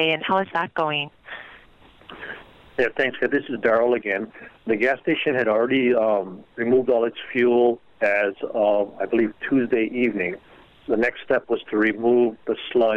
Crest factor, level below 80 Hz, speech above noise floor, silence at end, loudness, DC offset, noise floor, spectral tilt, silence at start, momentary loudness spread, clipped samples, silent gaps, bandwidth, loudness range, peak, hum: 18 dB; -60 dBFS; 30 dB; 0 s; -22 LUFS; under 0.1%; -51 dBFS; -7 dB/octave; 0 s; 15 LU; under 0.1%; none; 5.8 kHz; 4 LU; -4 dBFS; none